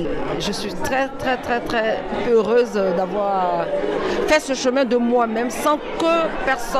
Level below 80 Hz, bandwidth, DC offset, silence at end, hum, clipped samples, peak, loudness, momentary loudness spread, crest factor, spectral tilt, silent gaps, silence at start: -40 dBFS; 15 kHz; under 0.1%; 0 s; none; under 0.1%; -6 dBFS; -20 LUFS; 6 LU; 14 dB; -4.5 dB/octave; none; 0 s